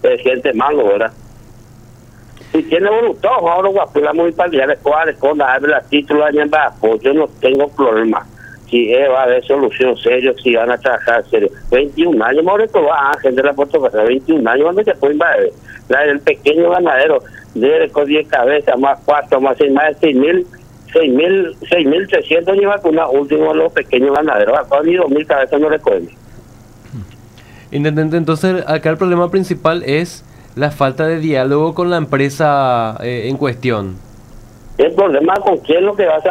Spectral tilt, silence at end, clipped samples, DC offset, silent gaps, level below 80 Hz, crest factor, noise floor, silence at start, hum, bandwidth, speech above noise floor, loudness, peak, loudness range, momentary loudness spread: -6.5 dB/octave; 0 s; under 0.1%; under 0.1%; none; -44 dBFS; 12 dB; -39 dBFS; 0.05 s; none; 13.5 kHz; 27 dB; -13 LUFS; 0 dBFS; 3 LU; 5 LU